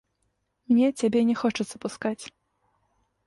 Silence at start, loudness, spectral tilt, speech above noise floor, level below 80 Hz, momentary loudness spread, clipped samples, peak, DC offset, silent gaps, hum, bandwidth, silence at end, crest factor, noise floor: 0.7 s; -25 LUFS; -5.5 dB/octave; 51 dB; -66 dBFS; 11 LU; under 0.1%; -12 dBFS; under 0.1%; none; none; 11.5 kHz; 1 s; 16 dB; -75 dBFS